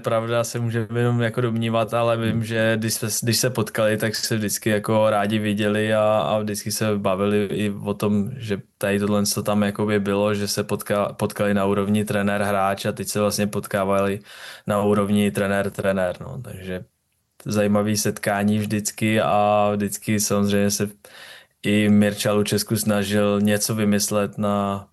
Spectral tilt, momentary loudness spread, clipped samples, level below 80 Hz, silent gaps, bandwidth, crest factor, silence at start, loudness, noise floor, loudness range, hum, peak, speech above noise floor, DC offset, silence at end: -5 dB/octave; 6 LU; under 0.1%; -62 dBFS; none; 13 kHz; 14 dB; 0 s; -21 LUFS; -55 dBFS; 3 LU; none; -8 dBFS; 34 dB; under 0.1%; 0.1 s